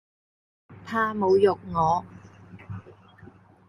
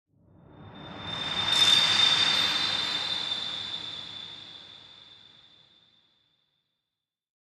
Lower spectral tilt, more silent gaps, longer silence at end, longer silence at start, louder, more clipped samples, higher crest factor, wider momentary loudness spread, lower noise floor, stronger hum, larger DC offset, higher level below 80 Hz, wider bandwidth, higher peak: first, -7 dB/octave vs -0.5 dB/octave; neither; second, 0.4 s vs 2.25 s; first, 0.7 s vs 0.55 s; about the same, -24 LUFS vs -23 LUFS; neither; about the same, 20 dB vs 20 dB; second, 21 LU vs 25 LU; second, -51 dBFS vs -88 dBFS; neither; neither; first, -56 dBFS vs -64 dBFS; second, 10.5 kHz vs 16 kHz; about the same, -8 dBFS vs -10 dBFS